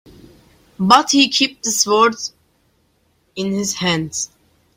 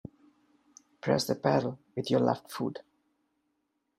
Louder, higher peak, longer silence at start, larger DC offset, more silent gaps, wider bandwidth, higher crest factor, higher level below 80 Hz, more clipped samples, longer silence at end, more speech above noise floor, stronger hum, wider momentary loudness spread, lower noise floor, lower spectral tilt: first, -16 LUFS vs -30 LUFS; first, 0 dBFS vs -10 dBFS; second, 0.8 s vs 1.05 s; neither; neither; about the same, 16.5 kHz vs 15.5 kHz; about the same, 18 dB vs 22 dB; first, -56 dBFS vs -70 dBFS; neither; second, 0.5 s vs 1.15 s; second, 45 dB vs 50 dB; neither; first, 16 LU vs 11 LU; second, -62 dBFS vs -79 dBFS; second, -2.5 dB/octave vs -5.5 dB/octave